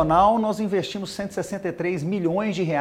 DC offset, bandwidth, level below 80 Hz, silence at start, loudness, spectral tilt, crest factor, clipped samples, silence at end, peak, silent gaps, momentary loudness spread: under 0.1%; 15 kHz; -48 dBFS; 0 s; -24 LUFS; -6 dB/octave; 16 dB; under 0.1%; 0 s; -6 dBFS; none; 11 LU